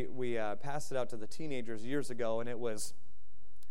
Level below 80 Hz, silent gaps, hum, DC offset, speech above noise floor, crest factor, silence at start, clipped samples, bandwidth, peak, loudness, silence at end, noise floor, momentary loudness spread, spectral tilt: -68 dBFS; none; none; 3%; 27 dB; 16 dB; 0 s; under 0.1%; 15.5 kHz; -20 dBFS; -39 LUFS; 0.75 s; -66 dBFS; 6 LU; -5 dB/octave